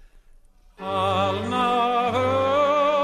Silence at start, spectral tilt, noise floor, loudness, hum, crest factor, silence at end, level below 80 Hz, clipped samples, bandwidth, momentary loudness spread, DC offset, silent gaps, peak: 0.8 s; -5.5 dB/octave; -52 dBFS; -22 LUFS; none; 12 dB; 0 s; -54 dBFS; under 0.1%; 13 kHz; 5 LU; under 0.1%; none; -12 dBFS